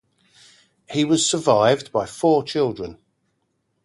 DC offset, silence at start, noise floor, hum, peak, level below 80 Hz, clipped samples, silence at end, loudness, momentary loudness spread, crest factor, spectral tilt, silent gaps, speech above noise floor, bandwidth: under 0.1%; 0.9 s; -71 dBFS; none; -2 dBFS; -58 dBFS; under 0.1%; 0.9 s; -20 LUFS; 11 LU; 20 dB; -4 dB/octave; none; 52 dB; 11.5 kHz